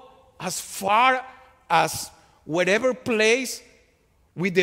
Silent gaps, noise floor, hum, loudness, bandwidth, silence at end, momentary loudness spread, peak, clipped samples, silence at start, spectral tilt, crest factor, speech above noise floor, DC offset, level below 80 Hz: none; -62 dBFS; none; -22 LUFS; 16 kHz; 0 s; 15 LU; -4 dBFS; under 0.1%; 0.4 s; -3.5 dB/octave; 20 dB; 40 dB; under 0.1%; -62 dBFS